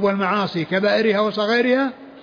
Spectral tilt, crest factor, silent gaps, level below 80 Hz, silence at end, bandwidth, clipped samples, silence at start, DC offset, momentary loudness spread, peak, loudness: -6.5 dB/octave; 12 dB; none; -64 dBFS; 0 s; 5.2 kHz; under 0.1%; 0 s; under 0.1%; 4 LU; -8 dBFS; -19 LUFS